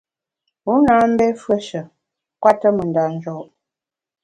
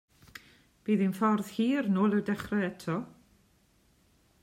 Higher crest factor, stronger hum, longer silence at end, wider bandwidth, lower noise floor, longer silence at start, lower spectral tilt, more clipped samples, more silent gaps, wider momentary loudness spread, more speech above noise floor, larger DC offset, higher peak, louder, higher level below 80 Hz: about the same, 18 dB vs 18 dB; neither; second, 0.8 s vs 1.35 s; second, 10.5 kHz vs 15.5 kHz; first, -88 dBFS vs -67 dBFS; first, 0.65 s vs 0.35 s; about the same, -7 dB/octave vs -7 dB/octave; neither; neither; second, 16 LU vs 23 LU; first, 72 dB vs 38 dB; neither; first, 0 dBFS vs -14 dBFS; first, -17 LUFS vs -30 LUFS; first, -54 dBFS vs -66 dBFS